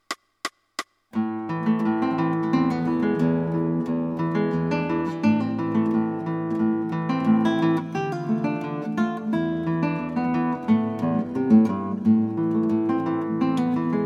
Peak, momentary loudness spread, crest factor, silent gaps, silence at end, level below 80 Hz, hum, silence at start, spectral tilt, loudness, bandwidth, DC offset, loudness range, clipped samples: -6 dBFS; 7 LU; 18 dB; none; 0 s; -60 dBFS; none; 0.1 s; -7.5 dB/octave; -24 LUFS; 10 kHz; under 0.1%; 3 LU; under 0.1%